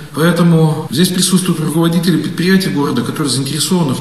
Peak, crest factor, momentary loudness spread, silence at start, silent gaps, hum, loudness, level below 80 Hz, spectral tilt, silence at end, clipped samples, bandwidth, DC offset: 0 dBFS; 12 dB; 5 LU; 0 s; none; none; -13 LUFS; -48 dBFS; -5 dB/octave; 0 s; under 0.1%; 14 kHz; 0.6%